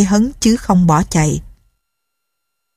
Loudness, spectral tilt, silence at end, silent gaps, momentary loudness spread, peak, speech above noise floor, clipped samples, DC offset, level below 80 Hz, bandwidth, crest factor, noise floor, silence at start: -14 LUFS; -5.5 dB/octave; 1.3 s; none; 6 LU; 0 dBFS; 62 dB; under 0.1%; under 0.1%; -34 dBFS; 15 kHz; 16 dB; -75 dBFS; 0 s